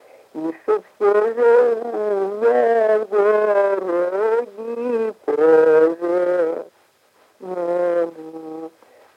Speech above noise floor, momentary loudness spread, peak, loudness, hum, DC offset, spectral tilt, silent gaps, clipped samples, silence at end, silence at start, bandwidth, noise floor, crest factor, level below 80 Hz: 41 dB; 16 LU; -4 dBFS; -18 LUFS; none; under 0.1%; -6.5 dB/octave; none; under 0.1%; 0.5 s; 0.35 s; 6.4 kHz; -58 dBFS; 16 dB; -80 dBFS